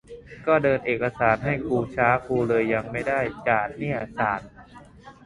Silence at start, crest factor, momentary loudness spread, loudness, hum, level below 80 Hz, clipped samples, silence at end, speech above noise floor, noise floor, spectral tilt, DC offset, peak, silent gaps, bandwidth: 0.1 s; 20 dB; 7 LU; -24 LUFS; none; -50 dBFS; under 0.1%; 0.15 s; 24 dB; -47 dBFS; -8 dB/octave; under 0.1%; -4 dBFS; none; 11.5 kHz